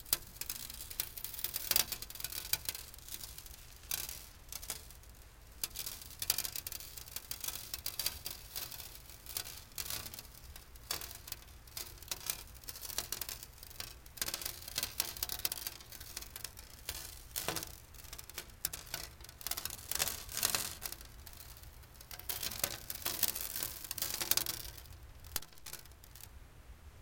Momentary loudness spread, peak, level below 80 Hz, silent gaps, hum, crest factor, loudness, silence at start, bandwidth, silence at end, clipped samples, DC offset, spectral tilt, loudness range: 18 LU; -10 dBFS; -58 dBFS; none; none; 34 dB; -39 LUFS; 0 s; 17 kHz; 0 s; under 0.1%; under 0.1%; -0.5 dB/octave; 6 LU